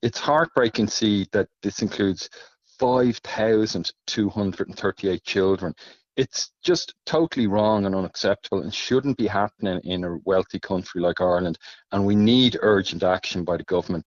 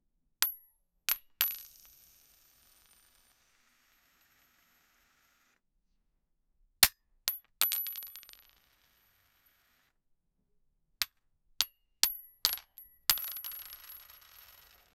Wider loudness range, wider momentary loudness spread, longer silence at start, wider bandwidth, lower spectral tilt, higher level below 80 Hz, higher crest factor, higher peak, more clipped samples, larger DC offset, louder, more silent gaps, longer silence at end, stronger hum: second, 3 LU vs 11 LU; second, 8 LU vs 24 LU; second, 0.05 s vs 0.4 s; second, 7.4 kHz vs over 20 kHz; first, -4 dB/octave vs 2 dB/octave; first, -54 dBFS vs -66 dBFS; second, 16 dB vs 36 dB; second, -6 dBFS vs -2 dBFS; neither; neither; first, -23 LUFS vs -32 LUFS; neither; second, 0.05 s vs 0.95 s; neither